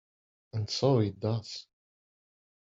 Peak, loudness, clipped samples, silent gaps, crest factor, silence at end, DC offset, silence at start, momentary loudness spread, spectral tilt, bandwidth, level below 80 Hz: -12 dBFS; -30 LUFS; under 0.1%; none; 20 dB; 1.1 s; under 0.1%; 0.55 s; 15 LU; -6.5 dB/octave; 7.8 kHz; -68 dBFS